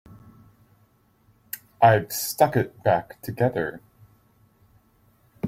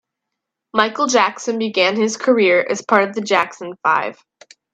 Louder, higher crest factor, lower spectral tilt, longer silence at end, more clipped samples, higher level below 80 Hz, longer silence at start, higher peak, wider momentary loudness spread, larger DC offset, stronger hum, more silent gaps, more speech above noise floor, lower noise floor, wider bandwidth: second, -23 LUFS vs -17 LUFS; about the same, 22 dB vs 18 dB; first, -5.5 dB/octave vs -3 dB/octave; second, 0 s vs 0.6 s; neither; first, -60 dBFS vs -70 dBFS; first, 1.55 s vs 0.75 s; second, -4 dBFS vs 0 dBFS; first, 19 LU vs 7 LU; neither; neither; neither; second, 40 dB vs 63 dB; second, -62 dBFS vs -80 dBFS; first, 16.5 kHz vs 9.2 kHz